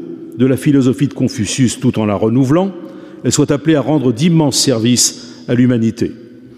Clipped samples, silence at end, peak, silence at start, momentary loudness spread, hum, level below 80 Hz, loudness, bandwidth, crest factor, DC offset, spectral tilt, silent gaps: under 0.1%; 0.1 s; -2 dBFS; 0 s; 10 LU; none; -50 dBFS; -14 LUFS; 15.5 kHz; 12 dB; under 0.1%; -5 dB/octave; none